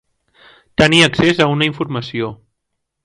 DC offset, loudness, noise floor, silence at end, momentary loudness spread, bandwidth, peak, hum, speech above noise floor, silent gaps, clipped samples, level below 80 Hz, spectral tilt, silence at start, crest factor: under 0.1%; -14 LUFS; -75 dBFS; 0.7 s; 14 LU; 11.5 kHz; 0 dBFS; none; 60 dB; none; under 0.1%; -44 dBFS; -4.5 dB/octave; 0.8 s; 18 dB